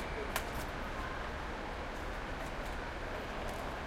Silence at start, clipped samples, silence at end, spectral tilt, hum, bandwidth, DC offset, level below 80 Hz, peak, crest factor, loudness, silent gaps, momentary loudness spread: 0 s; under 0.1%; 0 s; -4.5 dB/octave; none; 16.5 kHz; under 0.1%; -46 dBFS; -18 dBFS; 22 dB; -41 LUFS; none; 3 LU